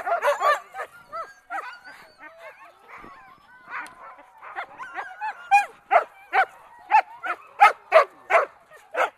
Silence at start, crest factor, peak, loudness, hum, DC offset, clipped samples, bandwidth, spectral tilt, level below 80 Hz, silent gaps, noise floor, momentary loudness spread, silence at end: 0 s; 22 dB; -2 dBFS; -22 LUFS; none; under 0.1%; under 0.1%; 14 kHz; -1 dB/octave; -72 dBFS; none; -50 dBFS; 24 LU; 0.1 s